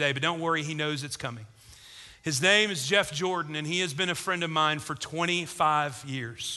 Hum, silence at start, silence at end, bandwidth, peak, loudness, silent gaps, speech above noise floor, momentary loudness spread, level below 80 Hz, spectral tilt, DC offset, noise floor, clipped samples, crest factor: none; 0 s; 0 s; 12.5 kHz; -6 dBFS; -27 LUFS; none; 21 dB; 13 LU; -64 dBFS; -3 dB/octave; under 0.1%; -50 dBFS; under 0.1%; 22 dB